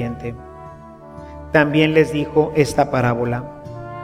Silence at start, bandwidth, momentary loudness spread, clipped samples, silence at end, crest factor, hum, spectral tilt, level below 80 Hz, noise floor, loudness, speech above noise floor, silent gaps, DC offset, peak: 0 s; 15 kHz; 23 LU; under 0.1%; 0 s; 18 dB; none; -6.5 dB/octave; -42 dBFS; -39 dBFS; -18 LUFS; 21 dB; none; under 0.1%; 0 dBFS